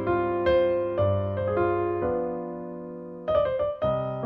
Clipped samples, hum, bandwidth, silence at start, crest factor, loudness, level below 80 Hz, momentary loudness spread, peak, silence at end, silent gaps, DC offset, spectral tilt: under 0.1%; none; 5.2 kHz; 0 s; 14 dB; -26 LUFS; -48 dBFS; 12 LU; -12 dBFS; 0 s; none; under 0.1%; -10 dB/octave